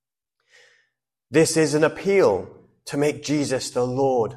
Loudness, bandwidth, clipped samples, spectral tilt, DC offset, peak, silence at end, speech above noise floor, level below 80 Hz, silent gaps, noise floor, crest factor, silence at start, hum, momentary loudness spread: -21 LUFS; 13 kHz; under 0.1%; -5 dB/octave; under 0.1%; -6 dBFS; 0 s; 55 dB; -58 dBFS; none; -75 dBFS; 16 dB; 1.3 s; none; 10 LU